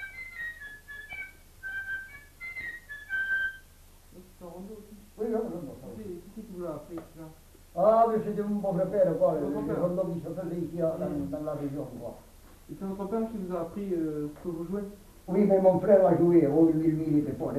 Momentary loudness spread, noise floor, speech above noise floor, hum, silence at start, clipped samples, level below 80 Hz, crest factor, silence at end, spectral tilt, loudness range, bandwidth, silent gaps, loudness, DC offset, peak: 21 LU; -54 dBFS; 27 dB; none; 0 s; under 0.1%; -56 dBFS; 20 dB; 0 s; -8 dB/octave; 13 LU; 14 kHz; none; -28 LUFS; under 0.1%; -8 dBFS